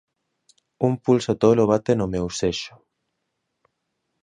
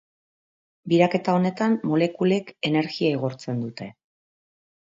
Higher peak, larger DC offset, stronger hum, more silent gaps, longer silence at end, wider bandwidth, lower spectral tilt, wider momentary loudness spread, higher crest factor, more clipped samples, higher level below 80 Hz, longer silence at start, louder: about the same, -2 dBFS vs -4 dBFS; neither; neither; neither; first, 1.55 s vs 0.95 s; first, 10 kHz vs 7.6 kHz; about the same, -6 dB/octave vs -7 dB/octave; second, 8 LU vs 12 LU; about the same, 20 dB vs 20 dB; neither; first, -50 dBFS vs -70 dBFS; about the same, 0.8 s vs 0.85 s; about the same, -21 LUFS vs -23 LUFS